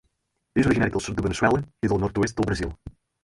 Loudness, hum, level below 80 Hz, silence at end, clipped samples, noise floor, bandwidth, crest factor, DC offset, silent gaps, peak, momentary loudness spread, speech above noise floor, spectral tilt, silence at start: -24 LUFS; none; -42 dBFS; 0.35 s; under 0.1%; -74 dBFS; 11.5 kHz; 20 dB; under 0.1%; none; -6 dBFS; 7 LU; 51 dB; -6 dB/octave; 0.55 s